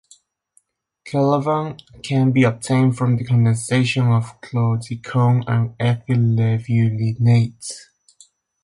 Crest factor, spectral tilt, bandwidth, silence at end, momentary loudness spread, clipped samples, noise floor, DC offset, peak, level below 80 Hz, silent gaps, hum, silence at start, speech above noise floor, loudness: 14 dB; -7 dB/octave; 11.5 kHz; 0.85 s; 9 LU; under 0.1%; -62 dBFS; under 0.1%; -6 dBFS; -52 dBFS; none; none; 1.05 s; 44 dB; -19 LUFS